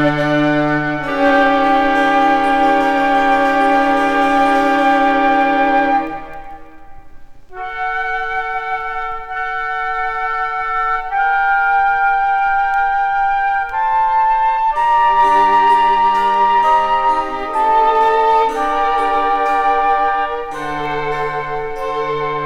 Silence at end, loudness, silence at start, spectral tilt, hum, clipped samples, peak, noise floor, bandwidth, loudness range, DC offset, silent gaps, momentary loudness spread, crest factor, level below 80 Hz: 0 s; -15 LUFS; 0 s; -5.5 dB/octave; none; under 0.1%; -2 dBFS; -36 dBFS; 12 kHz; 7 LU; 1%; none; 9 LU; 12 dB; -38 dBFS